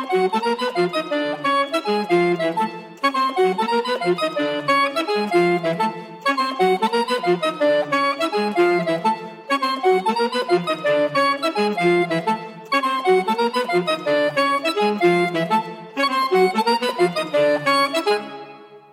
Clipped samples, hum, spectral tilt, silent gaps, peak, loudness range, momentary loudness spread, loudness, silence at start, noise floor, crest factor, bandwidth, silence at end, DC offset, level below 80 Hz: under 0.1%; none; -5 dB/octave; none; -6 dBFS; 1 LU; 5 LU; -20 LUFS; 0 s; -41 dBFS; 14 dB; 15.5 kHz; 0.15 s; under 0.1%; -78 dBFS